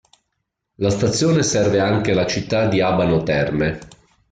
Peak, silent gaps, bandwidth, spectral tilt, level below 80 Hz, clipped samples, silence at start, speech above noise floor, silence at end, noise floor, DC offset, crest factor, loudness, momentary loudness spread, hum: -6 dBFS; none; 9.4 kHz; -5 dB/octave; -44 dBFS; under 0.1%; 0.8 s; 58 dB; 0.45 s; -76 dBFS; under 0.1%; 14 dB; -18 LUFS; 5 LU; none